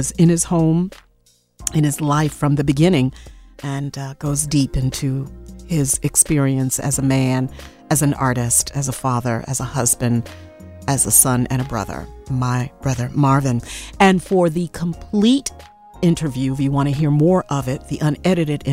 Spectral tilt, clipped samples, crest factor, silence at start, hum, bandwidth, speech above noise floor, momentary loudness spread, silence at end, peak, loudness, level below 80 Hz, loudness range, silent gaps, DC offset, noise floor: -5 dB/octave; under 0.1%; 18 dB; 0 s; none; 16 kHz; 40 dB; 11 LU; 0 s; 0 dBFS; -18 LUFS; -40 dBFS; 2 LU; none; under 0.1%; -58 dBFS